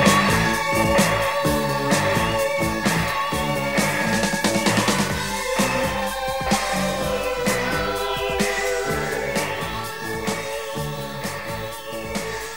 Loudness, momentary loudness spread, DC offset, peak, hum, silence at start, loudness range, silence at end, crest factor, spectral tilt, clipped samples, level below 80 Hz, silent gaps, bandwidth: -22 LUFS; 9 LU; 0.6%; -2 dBFS; none; 0 s; 5 LU; 0 s; 20 dB; -4 dB/octave; under 0.1%; -40 dBFS; none; 16.5 kHz